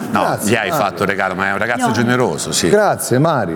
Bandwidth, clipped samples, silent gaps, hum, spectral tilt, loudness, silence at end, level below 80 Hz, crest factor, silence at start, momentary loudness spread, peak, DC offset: 19 kHz; under 0.1%; none; none; -4.5 dB/octave; -15 LUFS; 0 s; -50 dBFS; 16 dB; 0 s; 4 LU; 0 dBFS; under 0.1%